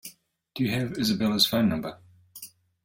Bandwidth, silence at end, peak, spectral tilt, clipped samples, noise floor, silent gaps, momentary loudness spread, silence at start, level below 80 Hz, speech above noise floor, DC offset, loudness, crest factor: 17 kHz; 0.4 s; -8 dBFS; -4.5 dB/octave; under 0.1%; -52 dBFS; none; 22 LU; 0.05 s; -60 dBFS; 26 dB; under 0.1%; -25 LUFS; 20 dB